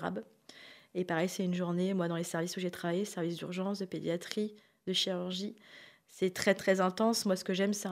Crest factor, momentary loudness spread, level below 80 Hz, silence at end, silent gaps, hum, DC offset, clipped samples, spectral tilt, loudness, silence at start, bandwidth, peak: 22 dB; 14 LU; -78 dBFS; 0 s; none; none; under 0.1%; under 0.1%; -4.5 dB/octave; -34 LUFS; 0 s; 16 kHz; -12 dBFS